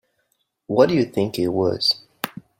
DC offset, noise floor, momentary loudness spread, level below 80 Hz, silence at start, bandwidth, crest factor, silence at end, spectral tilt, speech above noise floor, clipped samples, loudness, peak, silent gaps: under 0.1%; -70 dBFS; 10 LU; -60 dBFS; 0.7 s; 16.5 kHz; 20 dB; 0.3 s; -5.5 dB/octave; 51 dB; under 0.1%; -20 LUFS; -2 dBFS; none